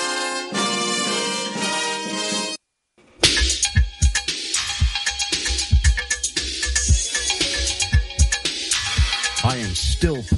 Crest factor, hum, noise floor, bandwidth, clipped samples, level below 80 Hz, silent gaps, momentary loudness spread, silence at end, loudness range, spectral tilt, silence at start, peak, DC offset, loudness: 20 dB; none; -59 dBFS; 11.5 kHz; under 0.1%; -26 dBFS; none; 5 LU; 0 s; 1 LU; -2.5 dB/octave; 0 s; 0 dBFS; under 0.1%; -20 LUFS